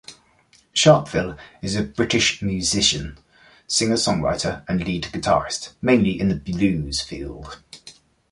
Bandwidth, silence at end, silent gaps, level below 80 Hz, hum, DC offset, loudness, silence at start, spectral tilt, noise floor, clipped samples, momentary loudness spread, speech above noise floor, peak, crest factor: 11.5 kHz; 0.4 s; none; -42 dBFS; none; under 0.1%; -21 LUFS; 0.1 s; -4 dB/octave; -57 dBFS; under 0.1%; 15 LU; 36 dB; -2 dBFS; 20 dB